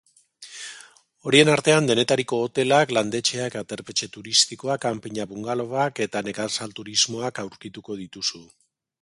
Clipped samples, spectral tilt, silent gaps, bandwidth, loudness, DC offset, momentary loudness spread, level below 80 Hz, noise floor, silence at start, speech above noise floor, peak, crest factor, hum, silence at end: under 0.1%; -3 dB/octave; none; 11.5 kHz; -22 LUFS; under 0.1%; 17 LU; -64 dBFS; -49 dBFS; 0.4 s; 26 dB; -2 dBFS; 22 dB; none; 0.6 s